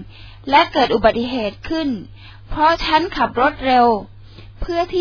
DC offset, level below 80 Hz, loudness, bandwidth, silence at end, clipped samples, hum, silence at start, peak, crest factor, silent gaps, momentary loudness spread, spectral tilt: under 0.1%; -36 dBFS; -17 LUFS; 5.4 kHz; 0 s; under 0.1%; none; 0 s; 0 dBFS; 18 dB; none; 10 LU; -5.5 dB/octave